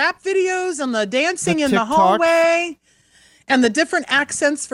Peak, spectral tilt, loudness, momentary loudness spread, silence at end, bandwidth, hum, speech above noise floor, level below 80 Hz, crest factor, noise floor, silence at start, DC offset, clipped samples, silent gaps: -4 dBFS; -3.5 dB/octave; -17 LUFS; 6 LU; 0.05 s; 16 kHz; none; 36 dB; -56 dBFS; 16 dB; -54 dBFS; 0 s; under 0.1%; under 0.1%; none